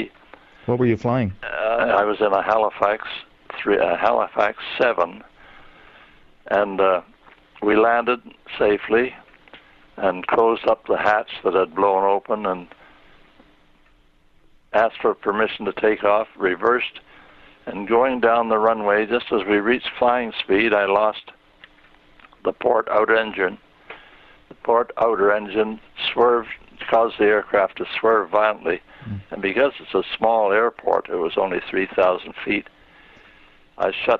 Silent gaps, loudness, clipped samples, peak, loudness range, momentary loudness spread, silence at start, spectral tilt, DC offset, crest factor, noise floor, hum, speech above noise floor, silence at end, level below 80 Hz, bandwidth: none; -20 LUFS; under 0.1%; -2 dBFS; 4 LU; 9 LU; 0 s; -7 dB/octave; under 0.1%; 18 dB; -56 dBFS; none; 36 dB; 0 s; -54 dBFS; 6.4 kHz